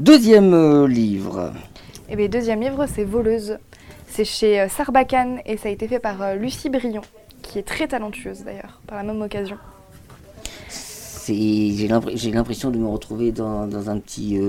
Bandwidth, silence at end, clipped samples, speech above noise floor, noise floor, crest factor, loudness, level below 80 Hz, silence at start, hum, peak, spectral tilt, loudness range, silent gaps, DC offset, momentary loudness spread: 16.5 kHz; 0 s; under 0.1%; 25 dB; -44 dBFS; 18 dB; -20 LUFS; -42 dBFS; 0 s; none; -2 dBFS; -5.5 dB/octave; 9 LU; none; under 0.1%; 18 LU